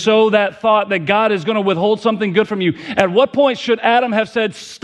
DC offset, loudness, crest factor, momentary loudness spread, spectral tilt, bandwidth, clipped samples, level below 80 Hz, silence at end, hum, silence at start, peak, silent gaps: under 0.1%; -15 LUFS; 16 dB; 5 LU; -5.5 dB/octave; 10.5 kHz; under 0.1%; -60 dBFS; 0.05 s; none; 0 s; 0 dBFS; none